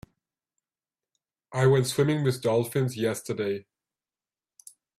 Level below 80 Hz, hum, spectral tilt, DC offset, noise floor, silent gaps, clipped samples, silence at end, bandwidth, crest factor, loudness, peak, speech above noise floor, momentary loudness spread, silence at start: -64 dBFS; none; -6 dB/octave; under 0.1%; under -90 dBFS; none; under 0.1%; 1.35 s; 15.5 kHz; 20 dB; -26 LUFS; -10 dBFS; over 65 dB; 9 LU; 1.5 s